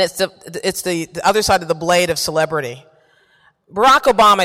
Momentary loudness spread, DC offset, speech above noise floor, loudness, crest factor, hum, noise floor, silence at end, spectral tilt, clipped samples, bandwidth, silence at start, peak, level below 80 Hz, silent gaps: 12 LU; under 0.1%; 40 dB; -16 LUFS; 12 dB; none; -55 dBFS; 0 s; -3 dB/octave; under 0.1%; 16.5 kHz; 0 s; -4 dBFS; -46 dBFS; none